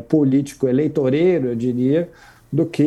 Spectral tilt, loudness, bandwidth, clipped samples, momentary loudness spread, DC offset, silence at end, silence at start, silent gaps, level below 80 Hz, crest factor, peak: -8 dB/octave; -19 LUFS; 12.5 kHz; under 0.1%; 6 LU; under 0.1%; 0 s; 0 s; none; -54 dBFS; 16 dB; -2 dBFS